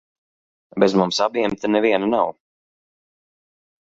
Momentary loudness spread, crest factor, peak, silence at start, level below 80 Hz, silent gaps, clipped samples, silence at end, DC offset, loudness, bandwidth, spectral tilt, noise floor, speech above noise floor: 5 LU; 20 dB; -2 dBFS; 0.75 s; -62 dBFS; none; under 0.1%; 1.55 s; under 0.1%; -19 LUFS; 8 kHz; -5 dB/octave; under -90 dBFS; over 72 dB